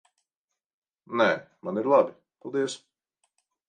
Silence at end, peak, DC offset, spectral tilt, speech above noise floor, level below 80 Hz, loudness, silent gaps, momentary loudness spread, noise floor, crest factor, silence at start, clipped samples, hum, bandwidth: 0.9 s; -8 dBFS; under 0.1%; -5 dB/octave; 63 dB; -80 dBFS; -26 LUFS; none; 12 LU; -87 dBFS; 20 dB; 1.1 s; under 0.1%; none; 9.8 kHz